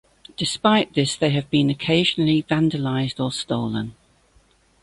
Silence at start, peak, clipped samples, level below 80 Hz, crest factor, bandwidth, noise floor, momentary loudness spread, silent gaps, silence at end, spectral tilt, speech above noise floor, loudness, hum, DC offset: 0.4 s; -4 dBFS; under 0.1%; -54 dBFS; 18 dB; 11.5 kHz; -58 dBFS; 9 LU; none; 0.9 s; -5.5 dB/octave; 38 dB; -21 LUFS; none; under 0.1%